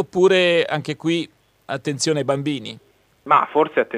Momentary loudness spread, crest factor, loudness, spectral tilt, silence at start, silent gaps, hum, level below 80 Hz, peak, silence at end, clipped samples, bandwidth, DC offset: 13 LU; 18 dB; -19 LUFS; -4.5 dB/octave; 0 s; none; none; -64 dBFS; -2 dBFS; 0 s; under 0.1%; 11.5 kHz; under 0.1%